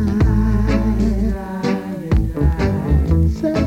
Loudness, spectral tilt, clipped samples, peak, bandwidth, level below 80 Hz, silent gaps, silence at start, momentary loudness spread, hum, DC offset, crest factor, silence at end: -18 LUFS; -8.5 dB/octave; under 0.1%; -4 dBFS; 8.8 kHz; -20 dBFS; none; 0 s; 5 LU; none; under 0.1%; 12 dB; 0 s